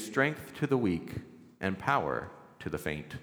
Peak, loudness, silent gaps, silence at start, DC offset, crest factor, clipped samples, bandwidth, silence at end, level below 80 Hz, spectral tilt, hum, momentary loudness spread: -10 dBFS; -32 LUFS; none; 0 s; under 0.1%; 22 dB; under 0.1%; over 20 kHz; 0 s; -58 dBFS; -6 dB/octave; none; 14 LU